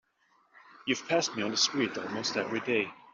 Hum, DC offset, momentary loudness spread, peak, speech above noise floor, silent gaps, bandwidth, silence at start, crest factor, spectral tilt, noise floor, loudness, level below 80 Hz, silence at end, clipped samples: none; under 0.1%; 6 LU; -14 dBFS; 38 dB; none; 7.8 kHz; 0.75 s; 20 dB; -2 dB/octave; -69 dBFS; -30 LUFS; -76 dBFS; 0.05 s; under 0.1%